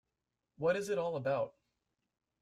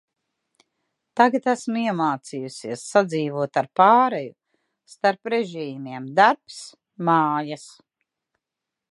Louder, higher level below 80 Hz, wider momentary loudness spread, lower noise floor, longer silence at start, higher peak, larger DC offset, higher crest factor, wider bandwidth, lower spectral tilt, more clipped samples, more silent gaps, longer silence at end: second, -36 LUFS vs -22 LUFS; about the same, -76 dBFS vs -78 dBFS; second, 4 LU vs 16 LU; about the same, -88 dBFS vs -86 dBFS; second, 0.6 s vs 1.15 s; second, -20 dBFS vs -2 dBFS; neither; about the same, 18 dB vs 22 dB; first, 14 kHz vs 11.5 kHz; about the same, -5.5 dB/octave vs -5 dB/octave; neither; neither; second, 0.9 s vs 1.2 s